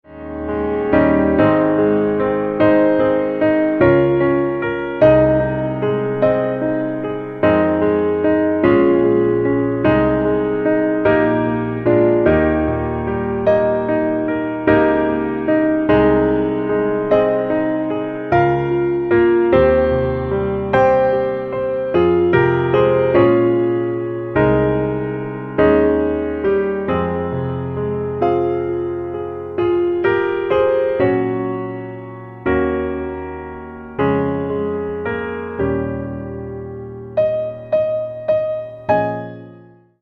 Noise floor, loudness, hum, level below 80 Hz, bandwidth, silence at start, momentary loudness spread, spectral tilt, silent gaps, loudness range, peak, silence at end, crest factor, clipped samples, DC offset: -44 dBFS; -17 LUFS; none; -38 dBFS; 4.7 kHz; 0.1 s; 10 LU; -10 dB/octave; none; 7 LU; 0 dBFS; 0.45 s; 16 dB; under 0.1%; under 0.1%